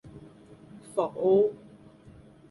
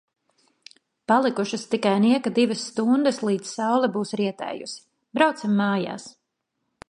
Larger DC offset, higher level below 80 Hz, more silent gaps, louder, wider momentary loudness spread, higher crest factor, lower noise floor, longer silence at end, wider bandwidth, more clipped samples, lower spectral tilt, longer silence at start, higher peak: neither; first, -64 dBFS vs -72 dBFS; neither; second, -26 LUFS vs -23 LUFS; first, 26 LU vs 13 LU; about the same, 18 dB vs 20 dB; second, -53 dBFS vs -78 dBFS; first, 0.95 s vs 0.8 s; about the same, 11.5 kHz vs 11 kHz; neither; first, -8 dB/octave vs -5 dB/octave; second, 0.05 s vs 1.1 s; second, -12 dBFS vs -4 dBFS